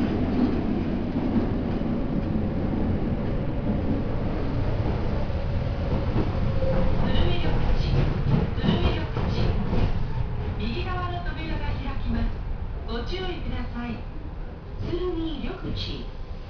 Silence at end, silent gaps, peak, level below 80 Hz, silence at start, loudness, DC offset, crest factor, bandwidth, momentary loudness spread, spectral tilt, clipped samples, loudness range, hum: 0 s; none; -8 dBFS; -30 dBFS; 0 s; -28 LUFS; under 0.1%; 16 dB; 5.4 kHz; 8 LU; -8.5 dB/octave; under 0.1%; 7 LU; none